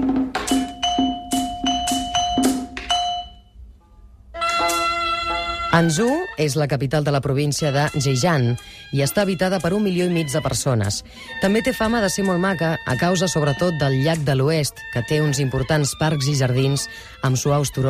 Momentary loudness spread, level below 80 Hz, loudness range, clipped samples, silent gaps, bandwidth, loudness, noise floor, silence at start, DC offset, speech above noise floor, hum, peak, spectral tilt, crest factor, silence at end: 5 LU; -42 dBFS; 3 LU; under 0.1%; none; 15.5 kHz; -20 LUFS; -47 dBFS; 0 s; under 0.1%; 27 dB; none; -6 dBFS; -5 dB/octave; 14 dB; 0 s